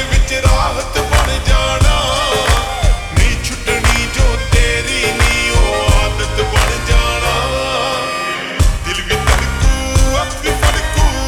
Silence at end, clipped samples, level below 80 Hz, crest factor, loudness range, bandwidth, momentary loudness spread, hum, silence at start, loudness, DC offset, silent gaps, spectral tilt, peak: 0 s; under 0.1%; -16 dBFS; 12 dB; 2 LU; 17.5 kHz; 4 LU; none; 0 s; -14 LUFS; under 0.1%; none; -3.5 dB/octave; 0 dBFS